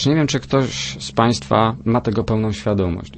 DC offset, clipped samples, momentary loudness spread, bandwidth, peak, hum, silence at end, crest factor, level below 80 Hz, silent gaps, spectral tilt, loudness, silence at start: under 0.1%; under 0.1%; 5 LU; 8.8 kHz; -2 dBFS; none; 0 s; 18 dB; -40 dBFS; none; -5.5 dB/octave; -19 LUFS; 0 s